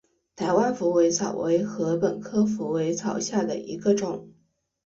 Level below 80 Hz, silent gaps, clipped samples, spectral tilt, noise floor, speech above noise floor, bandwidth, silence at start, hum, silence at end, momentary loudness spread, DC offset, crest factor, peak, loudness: -66 dBFS; none; under 0.1%; -5.5 dB/octave; -68 dBFS; 44 dB; 7.8 kHz; 0.4 s; none; 0.55 s; 6 LU; under 0.1%; 16 dB; -8 dBFS; -25 LUFS